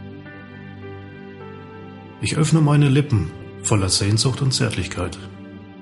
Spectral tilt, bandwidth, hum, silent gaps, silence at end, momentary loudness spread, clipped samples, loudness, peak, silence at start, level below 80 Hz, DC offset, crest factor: -5 dB/octave; 11.5 kHz; none; none; 0 s; 22 LU; under 0.1%; -19 LUFS; -4 dBFS; 0 s; -46 dBFS; under 0.1%; 16 dB